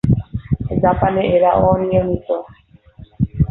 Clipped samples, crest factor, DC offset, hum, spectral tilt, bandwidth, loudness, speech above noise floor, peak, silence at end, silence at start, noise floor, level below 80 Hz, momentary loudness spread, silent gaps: under 0.1%; 14 dB; under 0.1%; none; -10.5 dB/octave; 4.1 kHz; -17 LUFS; 27 dB; -2 dBFS; 0 s; 0.05 s; -42 dBFS; -32 dBFS; 10 LU; none